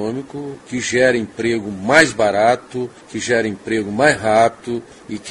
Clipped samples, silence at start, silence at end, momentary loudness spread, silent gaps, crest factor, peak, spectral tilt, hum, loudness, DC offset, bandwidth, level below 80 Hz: under 0.1%; 0 s; 0 s; 14 LU; none; 18 dB; 0 dBFS; -4 dB/octave; none; -17 LUFS; under 0.1%; 11.5 kHz; -52 dBFS